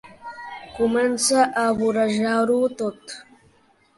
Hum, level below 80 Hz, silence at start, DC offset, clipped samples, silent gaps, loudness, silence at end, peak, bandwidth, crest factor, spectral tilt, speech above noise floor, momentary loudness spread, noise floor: none; -58 dBFS; 0.05 s; under 0.1%; under 0.1%; none; -21 LUFS; 0.75 s; -6 dBFS; 11.5 kHz; 18 dB; -3.5 dB/octave; 38 dB; 19 LU; -59 dBFS